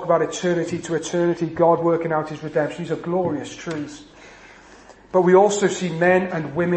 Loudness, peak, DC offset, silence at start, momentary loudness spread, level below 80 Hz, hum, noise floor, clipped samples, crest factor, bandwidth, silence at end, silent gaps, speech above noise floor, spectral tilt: -21 LUFS; -4 dBFS; under 0.1%; 0 s; 14 LU; -56 dBFS; none; -46 dBFS; under 0.1%; 18 dB; 8.8 kHz; 0 s; none; 26 dB; -5.5 dB/octave